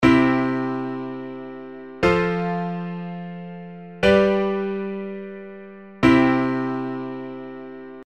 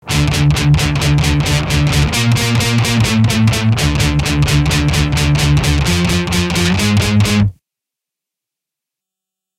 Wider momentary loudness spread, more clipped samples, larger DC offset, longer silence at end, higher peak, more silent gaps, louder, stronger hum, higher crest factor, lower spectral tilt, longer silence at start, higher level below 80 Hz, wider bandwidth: first, 20 LU vs 2 LU; neither; first, 0.2% vs under 0.1%; second, 0 s vs 2.05 s; about the same, -2 dBFS vs 0 dBFS; neither; second, -22 LUFS vs -13 LUFS; neither; first, 20 dB vs 14 dB; first, -7 dB/octave vs -5 dB/octave; about the same, 0 s vs 0.05 s; second, -46 dBFS vs -24 dBFS; second, 9 kHz vs 16 kHz